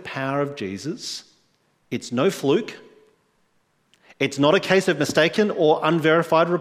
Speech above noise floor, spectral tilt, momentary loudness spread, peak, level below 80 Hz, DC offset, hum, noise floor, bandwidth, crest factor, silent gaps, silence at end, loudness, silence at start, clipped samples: 45 dB; -5 dB/octave; 13 LU; -2 dBFS; -66 dBFS; under 0.1%; none; -66 dBFS; 15.5 kHz; 20 dB; none; 0 s; -21 LUFS; 0 s; under 0.1%